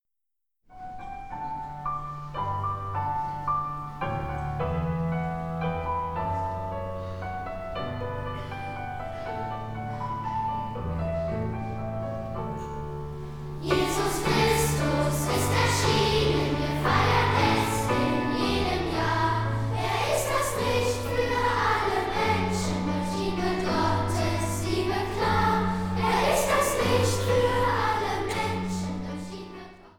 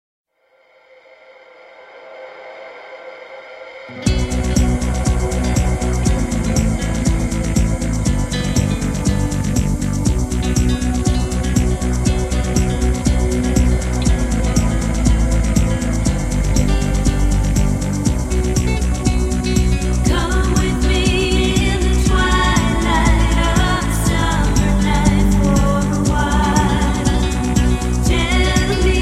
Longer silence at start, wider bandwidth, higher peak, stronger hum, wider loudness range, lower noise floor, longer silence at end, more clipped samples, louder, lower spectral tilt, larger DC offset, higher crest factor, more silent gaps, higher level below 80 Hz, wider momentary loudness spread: second, 0.7 s vs 1.8 s; first, 19 kHz vs 13.5 kHz; second, -10 dBFS vs 0 dBFS; neither; first, 9 LU vs 4 LU; first, -87 dBFS vs -56 dBFS; about the same, 0.1 s vs 0 s; neither; second, -27 LUFS vs -17 LUFS; about the same, -5 dB/octave vs -5.5 dB/octave; neither; about the same, 18 dB vs 16 dB; neither; second, -42 dBFS vs -20 dBFS; first, 12 LU vs 4 LU